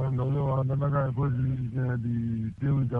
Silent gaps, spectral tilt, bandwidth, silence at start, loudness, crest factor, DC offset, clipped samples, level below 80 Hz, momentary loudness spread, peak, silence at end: none; -11 dB/octave; 3.5 kHz; 0 s; -28 LUFS; 10 dB; under 0.1%; under 0.1%; -48 dBFS; 3 LU; -16 dBFS; 0 s